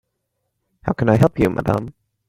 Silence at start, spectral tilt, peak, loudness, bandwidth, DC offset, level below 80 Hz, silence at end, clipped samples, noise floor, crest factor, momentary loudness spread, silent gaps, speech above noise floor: 0.85 s; -8.5 dB/octave; 0 dBFS; -18 LUFS; 16 kHz; under 0.1%; -42 dBFS; 0.4 s; under 0.1%; -74 dBFS; 20 dB; 13 LU; none; 57 dB